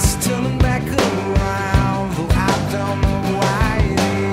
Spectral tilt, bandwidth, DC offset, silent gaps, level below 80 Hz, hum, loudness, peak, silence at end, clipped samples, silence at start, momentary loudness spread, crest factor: -5.5 dB/octave; 16 kHz; under 0.1%; none; -24 dBFS; none; -18 LUFS; 0 dBFS; 0 s; under 0.1%; 0 s; 2 LU; 16 dB